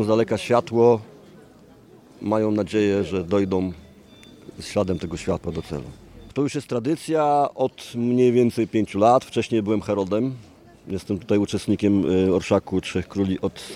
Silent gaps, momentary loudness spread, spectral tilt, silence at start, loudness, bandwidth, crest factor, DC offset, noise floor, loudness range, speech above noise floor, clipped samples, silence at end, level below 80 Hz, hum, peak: none; 13 LU; -6.5 dB/octave; 0 s; -22 LUFS; 14.5 kHz; 18 dB; under 0.1%; -49 dBFS; 6 LU; 28 dB; under 0.1%; 0 s; -52 dBFS; none; -4 dBFS